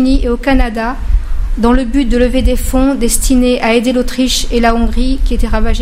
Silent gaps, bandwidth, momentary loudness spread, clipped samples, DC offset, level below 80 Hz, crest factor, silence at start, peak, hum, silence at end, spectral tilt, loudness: none; 16 kHz; 6 LU; under 0.1%; under 0.1%; -14 dBFS; 10 dB; 0 s; 0 dBFS; none; 0 s; -4.5 dB/octave; -13 LUFS